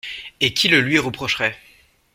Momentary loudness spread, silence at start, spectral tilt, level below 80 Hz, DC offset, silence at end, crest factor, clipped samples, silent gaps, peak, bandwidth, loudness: 9 LU; 0.05 s; -3.5 dB/octave; -54 dBFS; under 0.1%; 0.6 s; 20 dB; under 0.1%; none; -2 dBFS; 16.5 kHz; -18 LUFS